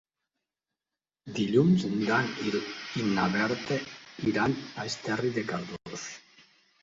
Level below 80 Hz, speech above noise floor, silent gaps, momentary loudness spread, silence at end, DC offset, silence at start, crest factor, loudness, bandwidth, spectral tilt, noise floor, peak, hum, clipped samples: -64 dBFS; over 62 dB; none; 14 LU; 0.65 s; under 0.1%; 1.25 s; 20 dB; -29 LUFS; 7.8 kHz; -5.5 dB/octave; under -90 dBFS; -12 dBFS; none; under 0.1%